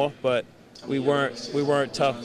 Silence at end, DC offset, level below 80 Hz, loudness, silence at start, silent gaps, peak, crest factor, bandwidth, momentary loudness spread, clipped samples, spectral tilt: 0 s; under 0.1%; -64 dBFS; -25 LUFS; 0 s; none; -10 dBFS; 14 dB; 12 kHz; 10 LU; under 0.1%; -5.5 dB/octave